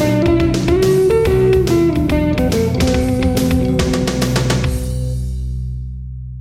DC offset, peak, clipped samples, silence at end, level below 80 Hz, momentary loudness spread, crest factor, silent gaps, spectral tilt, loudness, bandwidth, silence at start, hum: under 0.1%; -2 dBFS; under 0.1%; 0 s; -24 dBFS; 11 LU; 14 dB; none; -6.5 dB/octave; -15 LUFS; 16.5 kHz; 0 s; none